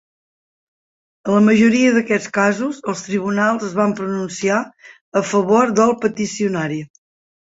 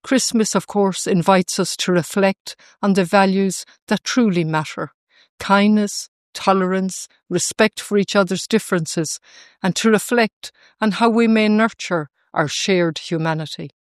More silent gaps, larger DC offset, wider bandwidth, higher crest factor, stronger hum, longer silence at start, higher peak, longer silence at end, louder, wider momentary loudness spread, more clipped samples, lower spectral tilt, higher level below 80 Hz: second, 5.01-5.12 s vs 2.40-2.45 s, 3.82-3.87 s, 4.94-5.07 s, 5.29-5.38 s, 6.08-6.33 s, 10.33-10.41 s; neither; second, 8 kHz vs 14 kHz; about the same, 16 dB vs 18 dB; neither; first, 1.25 s vs 0.05 s; about the same, -2 dBFS vs 0 dBFS; first, 0.7 s vs 0.2 s; about the same, -17 LUFS vs -18 LUFS; second, 10 LU vs 13 LU; neither; about the same, -5.5 dB/octave vs -4.5 dB/octave; about the same, -60 dBFS vs -62 dBFS